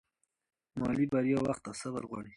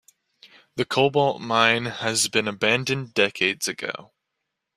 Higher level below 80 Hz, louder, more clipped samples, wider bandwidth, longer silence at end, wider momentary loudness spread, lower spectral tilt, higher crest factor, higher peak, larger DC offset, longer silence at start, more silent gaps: about the same, -62 dBFS vs -64 dBFS; second, -33 LUFS vs -22 LUFS; neither; second, 11.5 kHz vs 15 kHz; second, 0.05 s vs 0.75 s; about the same, 10 LU vs 11 LU; first, -6.5 dB/octave vs -3 dB/octave; second, 16 dB vs 22 dB; second, -18 dBFS vs -2 dBFS; neither; first, 0.75 s vs 0.45 s; neither